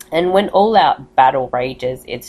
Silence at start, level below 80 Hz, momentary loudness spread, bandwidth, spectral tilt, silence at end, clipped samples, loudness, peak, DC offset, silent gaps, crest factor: 0.1 s; -48 dBFS; 10 LU; 14 kHz; -5.5 dB/octave; 0 s; under 0.1%; -15 LUFS; 0 dBFS; under 0.1%; none; 16 dB